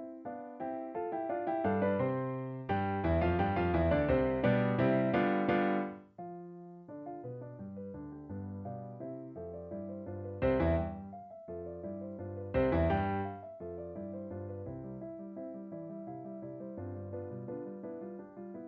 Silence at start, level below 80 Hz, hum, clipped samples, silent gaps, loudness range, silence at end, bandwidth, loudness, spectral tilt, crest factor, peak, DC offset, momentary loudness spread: 0 s; -50 dBFS; none; under 0.1%; none; 13 LU; 0 s; 5.4 kHz; -35 LUFS; -7 dB/octave; 18 dB; -16 dBFS; under 0.1%; 16 LU